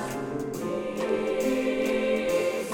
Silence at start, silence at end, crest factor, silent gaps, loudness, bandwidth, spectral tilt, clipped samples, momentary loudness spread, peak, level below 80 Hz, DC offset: 0 s; 0 s; 14 dB; none; -27 LUFS; 18 kHz; -5 dB/octave; under 0.1%; 7 LU; -14 dBFS; -56 dBFS; under 0.1%